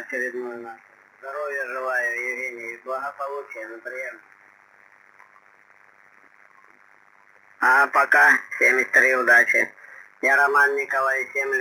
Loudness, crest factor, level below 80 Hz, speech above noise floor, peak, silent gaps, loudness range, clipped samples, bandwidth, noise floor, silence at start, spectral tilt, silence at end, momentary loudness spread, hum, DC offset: -20 LUFS; 18 dB; -84 dBFS; 34 dB; -4 dBFS; none; 20 LU; under 0.1%; 18 kHz; -55 dBFS; 0 s; -2 dB/octave; 0 s; 19 LU; none; under 0.1%